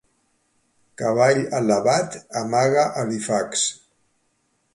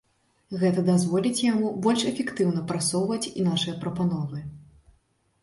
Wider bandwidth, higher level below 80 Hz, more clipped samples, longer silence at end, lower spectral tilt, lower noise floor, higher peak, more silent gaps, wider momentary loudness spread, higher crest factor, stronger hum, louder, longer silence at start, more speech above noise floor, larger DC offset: about the same, 11.5 kHz vs 11.5 kHz; about the same, -64 dBFS vs -60 dBFS; neither; first, 1 s vs 0.8 s; second, -4 dB/octave vs -5.5 dB/octave; about the same, -68 dBFS vs -67 dBFS; first, -6 dBFS vs -10 dBFS; neither; about the same, 8 LU vs 8 LU; about the same, 18 dB vs 16 dB; neither; first, -21 LUFS vs -25 LUFS; first, 1 s vs 0.5 s; first, 48 dB vs 42 dB; neither